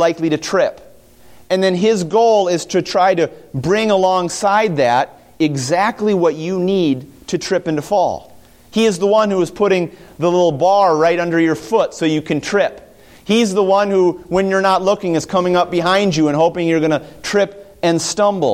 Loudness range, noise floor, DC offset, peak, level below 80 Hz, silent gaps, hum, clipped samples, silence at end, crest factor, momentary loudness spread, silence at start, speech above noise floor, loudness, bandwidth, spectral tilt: 2 LU; -45 dBFS; under 0.1%; -2 dBFS; -52 dBFS; none; none; under 0.1%; 0 s; 14 dB; 7 LU; 0 s; 29 dB; -16 LUFS; 15.5 kHz; -5 dB/octave